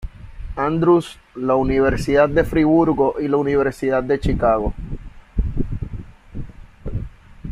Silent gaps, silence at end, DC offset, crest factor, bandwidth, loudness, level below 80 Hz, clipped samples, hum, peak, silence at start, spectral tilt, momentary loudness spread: none; 0 s; under 0.1%; 16 dB; 13 kHz; -19 LUFS; -30 dBFS; under 0.1%; none; -2 dBFS; 0 s; -8 dB/octave; 21 LU